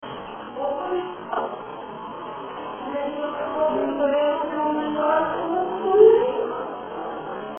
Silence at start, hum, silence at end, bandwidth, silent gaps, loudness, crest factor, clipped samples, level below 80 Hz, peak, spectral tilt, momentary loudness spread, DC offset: 0 s; none; 0 s; 3.5 kHz; none; -23 LUFS; 20 dB; under 0.1%; -60 dBFS; -4 dBFS; -9 dB/octave; 16 LU; under 0.1%